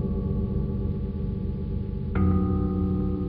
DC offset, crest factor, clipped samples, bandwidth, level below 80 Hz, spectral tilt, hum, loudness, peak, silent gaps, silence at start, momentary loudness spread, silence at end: under 0.1%; 14 dB; under 0.1%; 4.5 kHz; -32 dBFS; -12.5 dB/octave; 50 Hz at -35 dBFS; -27 LUFS; -12 dBFS; none; 0 s; 7 LU; 0 s